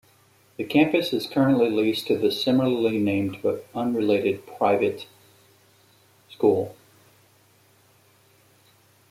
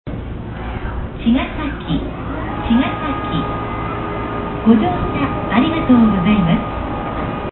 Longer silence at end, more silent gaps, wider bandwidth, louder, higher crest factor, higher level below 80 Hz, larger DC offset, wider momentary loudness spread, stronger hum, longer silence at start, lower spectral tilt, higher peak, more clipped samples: first, 2.4 s vs 0 s; neither; first, 15.5 kHz vs 4.2 kHz; second, -23 LUFS vs -18 LUFS; about the same, 18 dB vs 18 dB; second, -66 dBFS vs -30 dBFS; neither; second, 8 LU vs 12 LU; neither; first, 0.6 s vs 0.05 s; second, -6.5 dB/octave vs -12 dB/octave; second, -6 dBFS vs 0 dBFS; neither